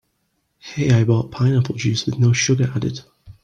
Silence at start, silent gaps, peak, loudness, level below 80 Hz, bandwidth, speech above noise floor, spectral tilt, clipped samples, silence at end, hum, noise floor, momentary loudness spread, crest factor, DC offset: 0.65 s; none; -4 dBFS; -19 LUFS; -50 dBFS; 8.8 kHz; 52 dB; -5.5 dB/octave; under 0.1%; 0.1 s; none; -69 dBFS; 10 LU; 14 dB; under 0.1%